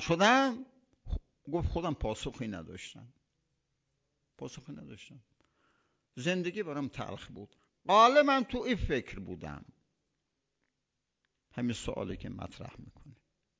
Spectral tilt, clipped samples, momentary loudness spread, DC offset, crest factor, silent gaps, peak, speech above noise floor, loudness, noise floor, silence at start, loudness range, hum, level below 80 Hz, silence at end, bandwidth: -5 dB/octave; under 0.1%; 23 LU; under 0.1%; 24 dB; none; -10 dBFS; 53 dB; -31 LUFS; -85 dBFS; 0 s; 16 LU; none; -50 dBFS; 0.5 s; 8 kHz